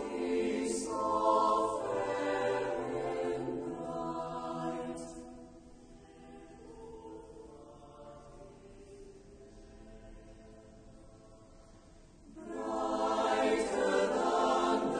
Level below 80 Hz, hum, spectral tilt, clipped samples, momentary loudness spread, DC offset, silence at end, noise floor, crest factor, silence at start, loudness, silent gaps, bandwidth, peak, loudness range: -60 dBFS; none; -4.5 dB/octave; under 0.1%; 25 LU; under 0.1%; 0 s; -57 dBFS; 20 dB; 0 s; -33 LUFS; none; 9.8 kHz; -16 dBFS; 23 LU